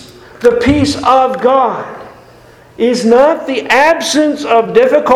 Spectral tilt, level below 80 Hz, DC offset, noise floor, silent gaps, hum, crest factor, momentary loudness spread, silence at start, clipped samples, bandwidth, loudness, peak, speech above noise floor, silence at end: -4.5 dB/octave; -38 dBFS; under 0.1%; -40 dBFS; none; none; 12 dB; 7 LU; 0 s; 0.4%; 15 kHz; -11 LUFS; 0 dBFS; 30 dB; 0 s